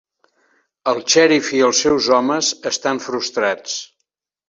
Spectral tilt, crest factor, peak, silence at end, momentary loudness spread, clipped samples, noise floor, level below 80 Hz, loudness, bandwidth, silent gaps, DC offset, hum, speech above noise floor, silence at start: -2 dB/octave; 16 dB; -2 dBFS; 0.65 s; 11 LU; under 0.1%; -75 dBFS; -58 dBFS; -17 LUFS; 7.8 kHz; none; under 0.1%; none; 58 dB; 0.85 s